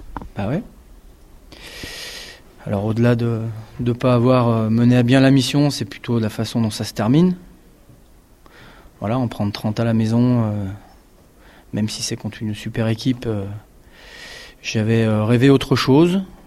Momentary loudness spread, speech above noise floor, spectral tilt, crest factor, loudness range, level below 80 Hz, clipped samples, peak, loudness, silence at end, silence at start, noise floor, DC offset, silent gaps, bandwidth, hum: 18 LU; 31 dB; -6.5 dB/octave; 18 dB; 8 LU; -46 dBFS; under 0.1%; -2 dBFS; -19 LUFS; 0.15 s; 0 s; -49 dBFS; under 0.1%; none; 14 kHz; none